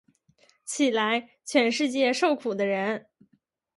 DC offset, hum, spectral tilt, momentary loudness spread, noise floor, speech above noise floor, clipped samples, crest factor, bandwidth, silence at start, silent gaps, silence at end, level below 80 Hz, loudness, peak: under 0.1%; none; -3.5 dB/octave; 10 LU; -69 dBFS; 44 dB; under 0.1%; 18 dB; 11.5 kHz; 0.65 s; none; 0.8 s; -78 dBFS; -26 LUFS; -8 dBFS